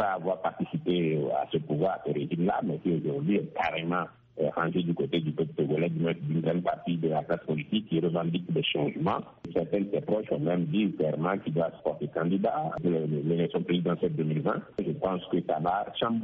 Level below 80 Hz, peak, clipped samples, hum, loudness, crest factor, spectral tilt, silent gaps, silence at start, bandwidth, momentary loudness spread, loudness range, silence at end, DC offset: -64 dBFS; -14 dBFS; under 0.1%; none; -29 LUFS; 14 dB; -6 dB/octave; none; 0 s; 4.3 kHz; 4 LU; 1 LU; 0 s; under 0.1%